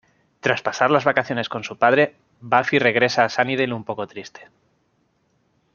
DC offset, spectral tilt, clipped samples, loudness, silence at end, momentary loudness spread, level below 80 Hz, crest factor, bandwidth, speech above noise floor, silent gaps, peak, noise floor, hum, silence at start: under 0.1%; -5 dB/octave; under 0.1%; -20 LUFS; 1.3 s; 13 LU; -66 dBFS; 20 dB; 7.2 kHz; 46 dB; none; -2 dBFS; -66 dBFS; none; 0.45 s